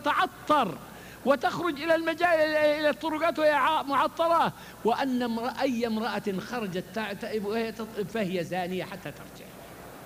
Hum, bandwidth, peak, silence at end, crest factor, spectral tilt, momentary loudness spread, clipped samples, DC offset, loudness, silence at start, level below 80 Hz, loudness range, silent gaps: none; 15.5 kHz; -10 dBFS; 0 s; 18 dB; -5 dB/octave; 15 LU; under 0.1%; under 0.1%; -27 LUFS; 0 s; -60 dBFS; 7 LU; none